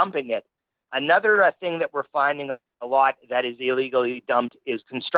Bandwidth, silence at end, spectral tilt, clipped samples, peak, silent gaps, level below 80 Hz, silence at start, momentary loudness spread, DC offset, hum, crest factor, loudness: 5 kHz; 0 s; -7 dB/octave; under 0.1%; -4 dBFS; none; -78 dBFS; 0 s; 12 LU; under 0.1%; none; 20 dB; -23 LUFS